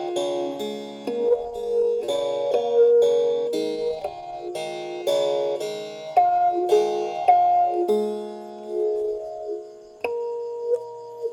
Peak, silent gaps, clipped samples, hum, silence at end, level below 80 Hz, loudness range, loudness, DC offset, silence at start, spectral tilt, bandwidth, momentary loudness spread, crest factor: -6 dBFS; none; under 0.1%; none; 0 s; -64 dBFS; 5 LU; -23 LUFS; under 0.1%; 0 s; -4.5 dB/octave; 15 kHz; 14 LU; 16 dB